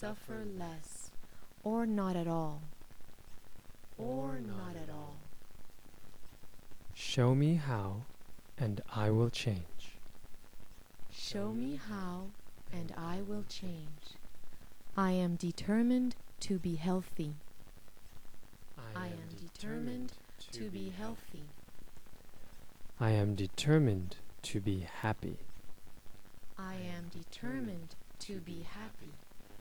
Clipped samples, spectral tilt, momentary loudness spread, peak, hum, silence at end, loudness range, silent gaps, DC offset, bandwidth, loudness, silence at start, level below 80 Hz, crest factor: under 0.1%; -6.5 dB/octave; 23 LU; -18 dBFS; none; 0 s; 11 LU; none; under 0.1%; over 20 kHz; -38 LUFS; 0 s; -56 dBFS; 20 dB